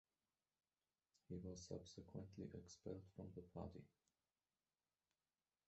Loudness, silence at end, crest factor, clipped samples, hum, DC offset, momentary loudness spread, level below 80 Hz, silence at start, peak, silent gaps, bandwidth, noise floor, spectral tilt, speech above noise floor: -57 LUFS; 1.8 s; 22 dB; under 0.1%; none; under 0.1%; 4 LU; -72 dBFS; 1.3 s; -38 dBFS; none; 8 kHz; under -90 dBFS; -7.5 dB/octave; over 34 dB